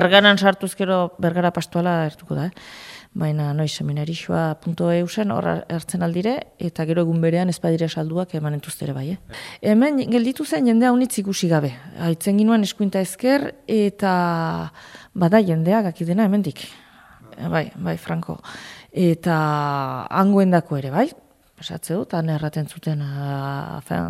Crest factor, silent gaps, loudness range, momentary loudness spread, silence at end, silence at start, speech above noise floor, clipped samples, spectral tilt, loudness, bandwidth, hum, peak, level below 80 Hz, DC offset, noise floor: 20 dB; none; 5 LU; 12 LU; 0 s; 0 s; 26 dB; under 0.1%; -6 dB/octave; -21 LUFS; 15 kHz; none; 0 dBFS; -58 dBFS; under 0.1%; -46 dBFS